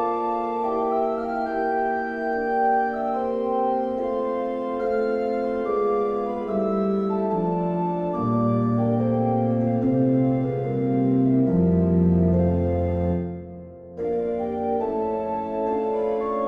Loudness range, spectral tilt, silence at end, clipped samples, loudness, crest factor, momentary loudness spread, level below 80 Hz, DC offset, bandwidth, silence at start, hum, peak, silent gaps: 4 LU; -10.5 dB/octave; 0 s; under 0.1%; -23 LUFS; 14 dB; 6 LU; -46 dBFS; under 0.1%; 5 kHz; 0 s; none; -8 dBFS; none